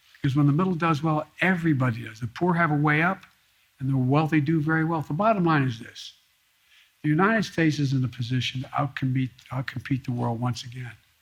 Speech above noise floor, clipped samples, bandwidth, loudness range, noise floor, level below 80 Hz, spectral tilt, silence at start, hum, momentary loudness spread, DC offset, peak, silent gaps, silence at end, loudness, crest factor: 41 dB; under 0.1%; 13 kHz; 3 LU; -65 dBFS; -60 dBFS; -7 dB/octave; 0.25 s; none; 12 LU; under 0.1%; -6 dBFS; none; 0.25 s; -25 LUFS; 20 dB